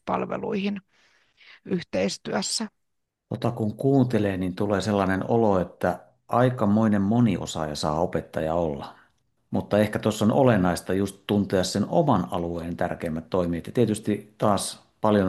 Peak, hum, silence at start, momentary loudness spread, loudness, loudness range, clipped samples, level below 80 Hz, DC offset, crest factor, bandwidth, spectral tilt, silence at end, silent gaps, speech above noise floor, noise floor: -4 dBFS; none; 0.05 s; 9 LU; -25 LUFS; 4 LU; under 0.1%; -56 dBFS; under 0.1%; 20 dB; 12.5 kHz; -6 dB/octave; 0 s; none; 55 dB; -79 dBFS